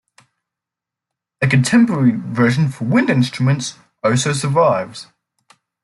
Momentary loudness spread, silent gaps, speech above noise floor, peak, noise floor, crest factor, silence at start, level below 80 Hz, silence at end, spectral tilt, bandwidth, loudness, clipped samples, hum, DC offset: 9 LU; none; 70 dB; -2 dBFS; -85 dBFS; 16 dB; 1.4 s; -56 dBFS; 0.8 s; -6 dB/octave; 12 kHz; -16 LUFS; under 0.1%; none; under 0.1%